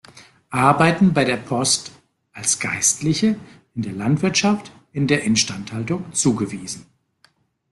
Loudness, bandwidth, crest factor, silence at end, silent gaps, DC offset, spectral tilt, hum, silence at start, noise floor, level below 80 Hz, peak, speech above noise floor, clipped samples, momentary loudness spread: -19 LUFS; 12.5 kHz; 20 dB; 0.9 s; none; under 0.1%; -4 dB/octave; none; 0.15 s; -60 dBFS; -54 dBFS; -2 dBFS; 41 dB; under 0.1%; 14 LU